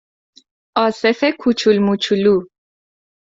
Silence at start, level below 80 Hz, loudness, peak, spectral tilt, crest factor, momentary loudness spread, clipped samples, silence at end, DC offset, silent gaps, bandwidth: 0.75 s; -58 dBFS; -16 LUFS; -2 dBFS; -5.5 dB/octave; 16 dB; 4 LU; under 0.1%; 0.85 s; under 0.1%; none; 7.8 kHz